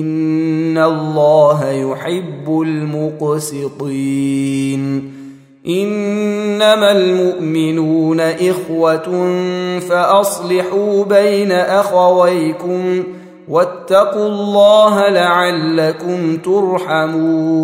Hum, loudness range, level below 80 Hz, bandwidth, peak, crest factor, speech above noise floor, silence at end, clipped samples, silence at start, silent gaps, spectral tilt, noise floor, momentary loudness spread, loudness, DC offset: none; 6 LU; -64 dBFS; 16 kHz; 0 dBFS; 14 dB; 22 dB; 0 s; under 0.1%; 0 s; none; -5.5 dB/octave; -35 dBFS; 9 LU; -14 LUFS; under 0.1%